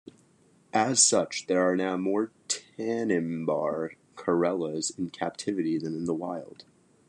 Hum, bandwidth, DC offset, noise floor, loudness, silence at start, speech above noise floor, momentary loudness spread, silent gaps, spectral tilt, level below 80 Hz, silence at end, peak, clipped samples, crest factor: none; 12 kHz; under 0.1%; -62 dBFS; -28 LUFS; 0.75 s; 35 dB; 12 LU; none; -3.5 dB/octave; -74 dBFS; 0.6 s; -6 dBFS; under 0.1%; 24 dB